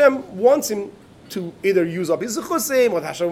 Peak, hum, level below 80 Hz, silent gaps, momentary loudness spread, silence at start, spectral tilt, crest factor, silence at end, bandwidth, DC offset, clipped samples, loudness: -2 dBFS; none; -62 dBFS; none; 13 LU; 0 s; -4.5 dB/octave; 18 dB; 0 s; 17 kHz; under 0.1%; under 0.1%; -20 LUFS